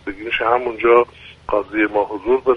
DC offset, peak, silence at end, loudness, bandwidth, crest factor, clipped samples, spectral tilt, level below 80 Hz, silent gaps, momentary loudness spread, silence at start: under 0.1%; 0 dBFS; 0 s; -18 LUFS; 5.6 kHz; 18 dB; under 0.1%; -6.5 dB/octave; -46 dBFS; none; 8 LU; 0.05 s